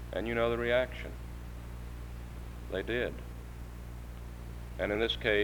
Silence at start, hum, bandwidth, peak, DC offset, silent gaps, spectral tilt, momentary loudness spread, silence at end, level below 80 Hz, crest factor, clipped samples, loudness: 0 s; 60 Hz at -50 dBFS; over 20 kHz; -16 dBFS; under 0.1%; none; -6 dB/octave; 16 LU; 0 s; -44 dBFS; 20 dB; under 0.1%; -35 LUFS